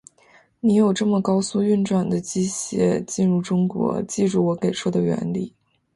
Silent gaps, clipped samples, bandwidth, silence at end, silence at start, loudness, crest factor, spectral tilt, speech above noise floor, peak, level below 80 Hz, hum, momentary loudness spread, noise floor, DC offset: none; under 0.1%; 11.5 kHz; 0.45 s; 0.65 s; -21 LUFS; 14 dB; -6 dB/octave; 35 dB; -8 dBFS; -58 dBFS; none; 6 LU; -55 dBFS; under 0.1%